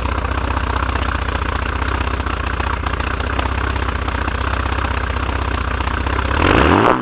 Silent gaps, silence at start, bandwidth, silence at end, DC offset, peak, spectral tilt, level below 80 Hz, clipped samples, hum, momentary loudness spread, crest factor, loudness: none; 0 s; 4 kHz; 0 s; under 0.1%; 0 dBFS; -10 dB/octave; -22 dBFS; under 0.1%; none; 7 LU; 18 dB; -19 LUFS